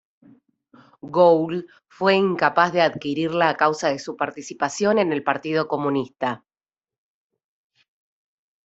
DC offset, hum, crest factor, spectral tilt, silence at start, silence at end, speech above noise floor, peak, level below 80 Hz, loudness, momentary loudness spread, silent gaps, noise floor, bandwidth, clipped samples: under 0.1%; none; 20 dB; -5 dB/octave; 1.05 s; 2.3 s; over 69 dB; -2 dBFS; -68 dBFS; -21 LUFS; 10 LU; none; under -90 dBFS; 8.2 kHz; under 0.1%